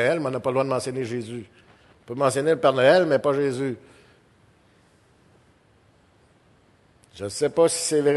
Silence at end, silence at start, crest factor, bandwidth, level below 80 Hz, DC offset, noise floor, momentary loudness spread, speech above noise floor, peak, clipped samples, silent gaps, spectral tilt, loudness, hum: 0 s; 0 s; 20 dB; 12.5 kHz; -64 dBFS; under 0.1%; -59 dBFS; 18 LU; 37 dB; -4 dBFS; under 0.1%; none; -4.5 dB/octave; -22 LUFS; none